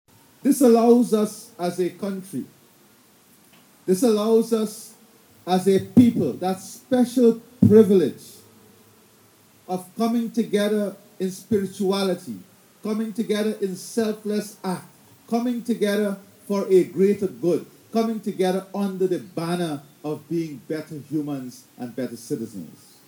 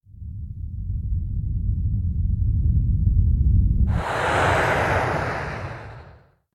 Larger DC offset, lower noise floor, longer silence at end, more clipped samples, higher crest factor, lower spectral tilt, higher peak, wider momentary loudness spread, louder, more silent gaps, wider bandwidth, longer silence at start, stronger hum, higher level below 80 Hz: neither; first, -55 dBFS vs -50 dBFS; about the same, 0.35 s vs 0.45 s; neither; first, 22 dB vs 14 dB; about the same, -6.5 dB/octave vs -6.5 dB/octave; first, -2 dBFS vs -8 dBFS; about the same, 16 LU vs 15 LU; about the same, -23 LUFS vs -23 LUFS; neither; first, over 20 kHz vs 12 kHz; first, 0.45 s vs 0.15 s; neither; second, -66 dBFS vs -26 dBFS